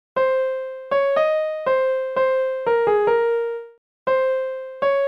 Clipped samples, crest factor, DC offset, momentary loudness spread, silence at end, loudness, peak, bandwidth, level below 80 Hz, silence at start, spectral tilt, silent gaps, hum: under 0.1%; 14 dB; 0.1%; 9 LU; 0 s; -21 LUFS; -8 dBFS; 5.4 kHz; -72 dBFS; 0.15 s; -5 dB/octave; 3.78-4.06 s; none